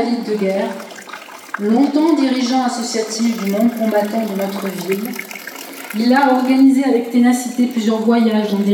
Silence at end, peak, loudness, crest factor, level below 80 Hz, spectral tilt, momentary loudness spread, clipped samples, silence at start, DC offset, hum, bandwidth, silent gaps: 0 s; -2 dBFS; -16 LUFS; 14 dB; -76 dBFS; -5 dB/octave; 16 LU; under 0.1%; 0 s; under 0.1%; none; 18.5 kHz; none